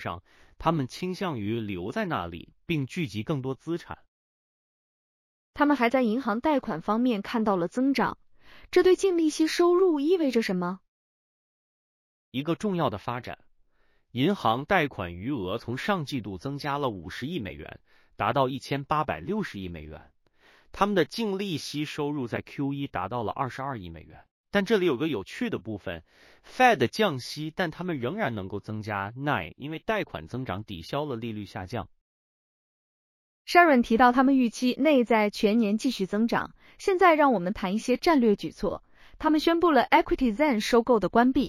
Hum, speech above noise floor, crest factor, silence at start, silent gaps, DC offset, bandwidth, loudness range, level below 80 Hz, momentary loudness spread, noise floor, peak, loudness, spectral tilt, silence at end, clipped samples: none; 39 dB; 22 dB; 0 s; 4.08-5.53 s, 10.88-12.32 s, 24.31-24.44 s, 32.01-33.45 s; under 0.1%; 15.5 kHz; 9 LU; -54 dBFS; 14 LU; -65 dBFS; -6 dBFS; -26 LUFS; -6 dB/octave; 0 s; under 0.1%